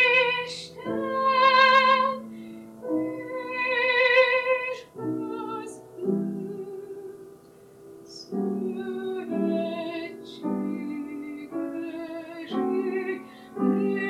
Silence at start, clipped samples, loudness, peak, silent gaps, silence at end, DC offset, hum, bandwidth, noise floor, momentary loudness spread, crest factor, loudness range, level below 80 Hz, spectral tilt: 0 s; under 0.1%; -25 LUFS; -6 dBFS; none; 0 s; under 0.1%; none; 13.5 kHz; -51 dBFS; 20 LU; 20 dB; 12 LU; -72 dBFS; -5 dB/octave